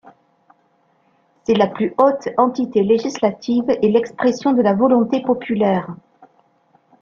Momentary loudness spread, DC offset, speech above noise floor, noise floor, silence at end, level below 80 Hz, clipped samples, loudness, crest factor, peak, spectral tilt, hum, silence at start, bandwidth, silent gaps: 5 LU; under 0.1%; 44 dB; -60 dBFS; 1.05 s; -60 dBFS; under 0.1%; -17 LUFS; 16 dB; -2 dBFS; -6.5 dB/octave; none; 1.5 s; 7.2 kHz; none